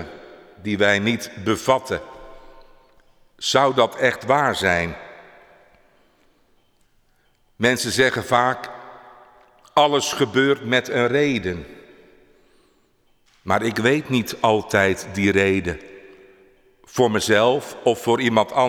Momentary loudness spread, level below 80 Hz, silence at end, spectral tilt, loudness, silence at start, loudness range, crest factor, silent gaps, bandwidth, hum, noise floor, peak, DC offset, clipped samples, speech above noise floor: 12 LU; -52 dBFS; 0 s; -4.5 dB/octave; -20 LUFS; 0 s; 4 LU; 18 dB; none; 19.5 kHz; none; -61 dBFS; -4 dBFS; under 0.1%; under 0.1%; 42 dB